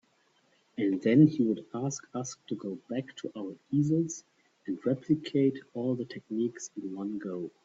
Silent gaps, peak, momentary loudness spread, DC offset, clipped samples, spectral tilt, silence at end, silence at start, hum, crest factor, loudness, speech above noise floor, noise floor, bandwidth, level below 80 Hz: none; -10 dBFS; 15 LU; under 0.1%; under 0.1%; -6.5 dB/octave; 0.15 s; 0.75 s; none; 20 dB; -31 LUFS; 39 dB; -69 dBFS; 7.8 kHz; -74 dBFS